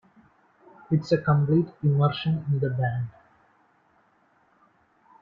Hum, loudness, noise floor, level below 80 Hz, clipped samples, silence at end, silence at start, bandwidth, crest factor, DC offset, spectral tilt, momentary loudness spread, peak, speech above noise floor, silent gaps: none; -25 LUFS; -64 dBFS; -62 dBFS; under 0.1%; 2.1 s; 0.9 s; 7.2 kHz; 18 dB; under 0.1%; -9 dB/octave; 7 LU; -8 dBFS; 41 dB; none